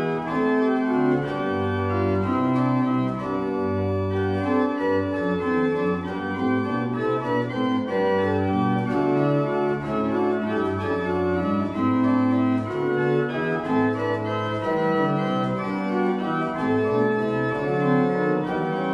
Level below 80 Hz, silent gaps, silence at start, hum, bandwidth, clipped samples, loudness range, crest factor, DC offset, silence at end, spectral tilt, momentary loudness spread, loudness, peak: -56 dBFS; none; 0 s; none; 8.2 kHz; under 0.1%; 1 LU; 14 dB; under 0.1%; 0 s; -8.5 dB/octave; 4 LU; -23 LUFS; -8 dBFS